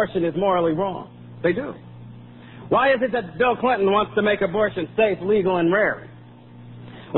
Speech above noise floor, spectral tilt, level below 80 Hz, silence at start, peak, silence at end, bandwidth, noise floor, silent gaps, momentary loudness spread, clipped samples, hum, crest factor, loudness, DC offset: 23 dB; -11 dB/octave; -54 dBFS; 0 s; -6 dBFS; 0 s; 4.2 kHz; -44 dBFS; none; 22 LU; under 0.1%; none; 16 dB; -21 LUFS; 0.1%